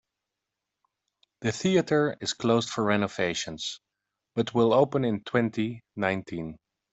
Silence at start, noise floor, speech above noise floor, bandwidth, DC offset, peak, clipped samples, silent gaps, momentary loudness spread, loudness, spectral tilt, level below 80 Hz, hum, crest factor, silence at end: 1.4 s; -86 dBFS; 60 dB; 8.2 kHz; under 0.1%; -8 dBFS; under 0.1%; none; 12 LU; -27 LUFS; -5 dB/octave; -64 dBFS; none; 20 dB; 0.4 s